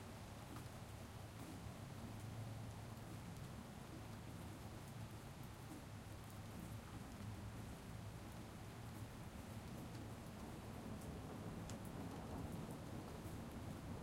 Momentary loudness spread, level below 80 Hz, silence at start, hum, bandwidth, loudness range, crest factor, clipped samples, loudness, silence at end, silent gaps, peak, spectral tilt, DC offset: 4 LU; -62 dBFS; 0 s; none; 16 kHz; 3 LU; 16 dB; under 0.1%; -53 LUFS; 0 s; none; -36 dBFS; -5.5 dB/octave; under 0.1%